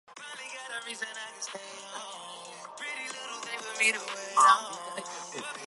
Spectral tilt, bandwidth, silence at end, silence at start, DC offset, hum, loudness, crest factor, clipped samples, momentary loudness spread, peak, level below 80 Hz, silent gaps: 0.5 dB/octave; 11.5 kHz; 0 s; 0.1 s; under 0.1%; none; -30 LUFS; 24 dB; under 0.1%; 19 LU; -8 dBFS; under -90 dBFS; none